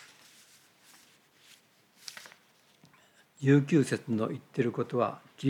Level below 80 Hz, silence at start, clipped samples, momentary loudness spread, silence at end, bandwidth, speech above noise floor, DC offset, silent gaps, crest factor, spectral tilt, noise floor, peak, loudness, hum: -84 dBFS; 2.05 s; under 0.1%; 22 LU; 0 s; 14.5 kHz; 36 dB; under 0.1%; none; 20 dB; -7 dB/octave; -64 dBFS; -12 dBFS; -29 LUFS; none